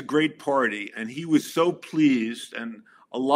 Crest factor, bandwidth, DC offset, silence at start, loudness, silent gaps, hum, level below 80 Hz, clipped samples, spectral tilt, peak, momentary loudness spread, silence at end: 18 dB; 16 kHz; under 0.1%; 0 s; -25 LUFS; none; none; -78 dBFS; under 0.1%; -5 dB/octave; -6 dBFS; 13 LU; 0 s